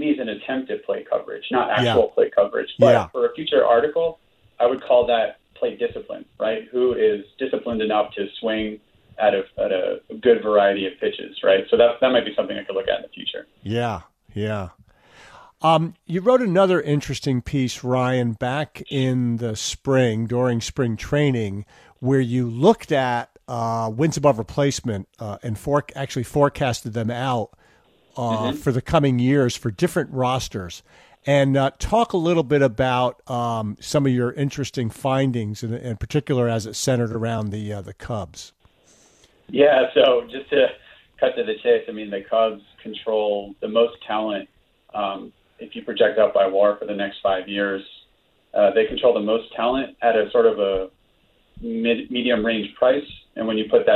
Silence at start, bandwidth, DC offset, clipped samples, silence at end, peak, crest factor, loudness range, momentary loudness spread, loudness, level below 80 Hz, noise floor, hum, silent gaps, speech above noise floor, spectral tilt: 0 s; 14.5 kHz; under 0.1%; under 0.1%; 0 s; -2 dBFS; 20 dB; 5 LU; 12 LU; -21 LUFS; -48 dBFS; -62 dBFS; none; none; 41 dB; -6 dB/octave